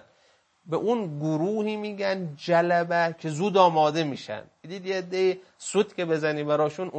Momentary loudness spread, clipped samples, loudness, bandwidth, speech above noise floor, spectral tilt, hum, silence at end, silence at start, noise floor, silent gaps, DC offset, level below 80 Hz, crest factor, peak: 11 LU; under 0.1%; -26 LUFS; 8.8 kHz; 38 dB; -5.5 dB/octave; none; 0 s; 0.65 s; -64 dBFS; none; under 0.1%; -76 dBFS; 22 dB; -4 dBFS